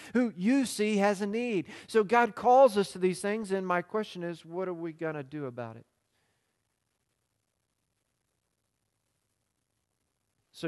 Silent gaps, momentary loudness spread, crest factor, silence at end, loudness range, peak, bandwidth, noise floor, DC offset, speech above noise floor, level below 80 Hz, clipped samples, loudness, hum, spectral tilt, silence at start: none; 15 LU; 20 dB; 0 s; 16 LU; -10 dBFS; 12.5 kHz; -80 dBFS; under 0.1%; 52 dB; -76 dBFS; under 0.1%; -29 LUFS; none; -5.5 dB/octave; 0 s